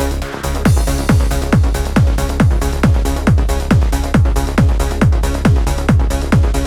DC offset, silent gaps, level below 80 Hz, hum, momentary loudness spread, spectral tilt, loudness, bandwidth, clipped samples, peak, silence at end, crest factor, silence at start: under 0.1%; none; -16 dBFS; none; 1 LU; -6.5 dB/octave; -15 LUFS; 16 kHz; under 0.1%; 0 dBFS; 0 s; 12 dB; 0 s